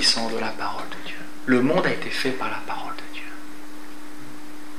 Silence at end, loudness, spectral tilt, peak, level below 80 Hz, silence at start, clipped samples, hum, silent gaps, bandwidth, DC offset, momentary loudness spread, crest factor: 0 s; -25 LUFS; -3.5 dB/octave; -4 dBFS; -72 dBFS; 0 s; under 0.1%; none; none; 15.5 kHz; 5%; 21 LU; 22 dB